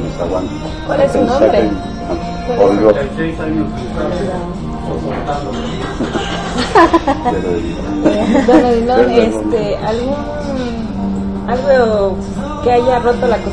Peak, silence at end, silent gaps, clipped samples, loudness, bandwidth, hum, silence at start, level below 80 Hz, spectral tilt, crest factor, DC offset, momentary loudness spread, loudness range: 0 dBFS; 0 s; none; under 0.1%; -15 LUFS; 10.5 kHz; none; 0 s; -30 dBFS; -6.5 dB/octave; 14 dB; 1%; 11 LU; 5 LU